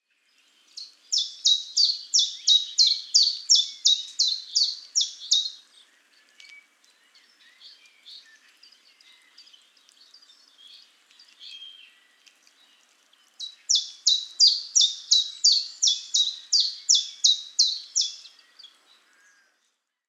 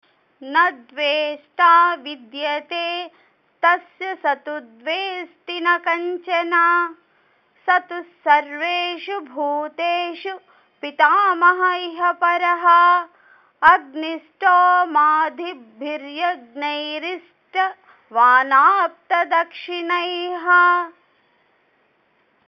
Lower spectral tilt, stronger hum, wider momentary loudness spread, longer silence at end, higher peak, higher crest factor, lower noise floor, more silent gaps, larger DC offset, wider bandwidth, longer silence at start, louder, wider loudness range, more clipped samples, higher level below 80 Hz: second, 8.5 dB/octave vs -3 dB/octave; neither; about the same, 18 LU vs 16 LU; first, 1.9 s vs 1.55 s; second, -4 dBFS vs 0 dBFS; about the same, 22 dB vs 20 dB; first, -75 dBFS vs -62 dBFS; neither; neither; first, 13.5 kHz vs 6.2 kHz; first, 0.75 s vs 0.4 s; about the same, -20 LUFS vs -18 LUFS; first, 9 LU vs 6 LU; neither; second, under -90 dBFS vs -72 dBFS